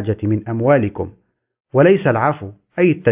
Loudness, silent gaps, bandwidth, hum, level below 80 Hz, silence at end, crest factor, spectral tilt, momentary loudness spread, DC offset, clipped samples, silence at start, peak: -16 LUFS; none; 3.8 kHz; none; -46 dBFS; 0 s; 16 dB; -12 dB/octave; 16 LU; under 0.1%; under 0.1%; 0 s; -2 dBFS